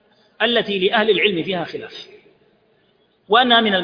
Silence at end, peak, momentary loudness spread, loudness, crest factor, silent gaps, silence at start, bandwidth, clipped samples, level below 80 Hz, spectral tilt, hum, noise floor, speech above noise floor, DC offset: 0 s; -2 dBFS; 18 LU; -17 LUFS; 18 dB; none; 0.4 s; 5.2 kHz; under 0.1%; -62 dBFS; -6 dB/octave; none; -60 dBFS; 43 dB; under 0.1%